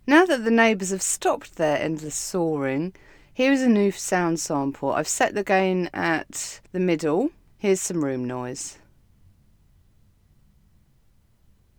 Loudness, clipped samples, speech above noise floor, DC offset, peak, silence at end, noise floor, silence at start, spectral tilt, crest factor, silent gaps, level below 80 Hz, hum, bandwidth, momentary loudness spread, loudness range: -23 LUFS; under 0.1%; 37 dB; under 0.1%; -4 dBFS; 3.05 s; -60 dBFS; 0.05 s; -4 dB/octave; 20 dB; none; -58 dBFS; none; 20 kHz; 12 LU; 9 LU